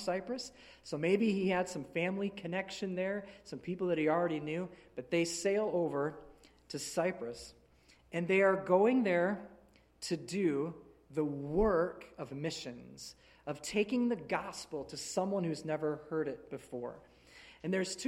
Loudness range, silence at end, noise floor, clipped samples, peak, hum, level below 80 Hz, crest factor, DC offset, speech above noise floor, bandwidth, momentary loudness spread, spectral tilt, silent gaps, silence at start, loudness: 5 LU; 0 s; -65 dBFS; under 0.1%; -14 dBFS; none; -60 dBFS; 20 dB; under 0.1%; 30 dB; 14.5 kHz; 16 LU; -5 dB/octave; none; 0 s; -35 LUFS